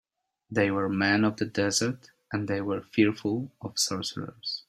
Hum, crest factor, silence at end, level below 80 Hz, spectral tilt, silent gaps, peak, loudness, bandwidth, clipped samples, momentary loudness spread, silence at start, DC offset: none; 18 dB; 0.1 s; -66 dBFS; -4 dB/octave; none; -10 dBFS; -28 LUFS; 15.5 kHz; under 0.1%; 9 LU; 0.5 s; under 0.1%